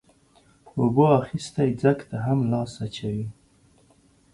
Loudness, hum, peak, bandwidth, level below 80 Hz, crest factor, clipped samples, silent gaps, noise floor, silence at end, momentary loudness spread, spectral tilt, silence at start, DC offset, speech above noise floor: -24 LUFS; none; -6 dBFS; 11.5 kHz; -56 dBFS; 20 dB; under 0.1%; none; -59 dBFS; 1 s; 13 LU; -7.5 dB/octave; 0.75 s; under 0.1%; 36 dB